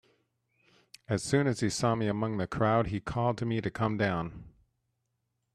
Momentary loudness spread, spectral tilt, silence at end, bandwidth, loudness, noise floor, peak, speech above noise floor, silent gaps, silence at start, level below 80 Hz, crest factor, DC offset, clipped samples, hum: 7 LU; -6 dB/octave; 1.05 s; 13 kHz; -30 LUFS; -81 dBFS; -12 dBFS; 51 dB; none; 1.1 s; -56 dBFS; 20 dB; under 0.1%; under 0.1%; none